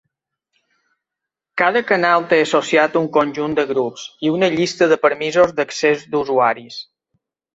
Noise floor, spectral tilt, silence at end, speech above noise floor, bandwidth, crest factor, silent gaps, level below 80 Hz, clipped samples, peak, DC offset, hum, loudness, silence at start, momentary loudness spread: -84 dBFS; -4.5 dB/octave; 0.75 s; 67 dB; 8 kHz; 18 dB; none; -60 dBFS; under 0.1%; 0 dBFS; under 0.1%; none; -17 LUFS; 1.55 s; 8 LU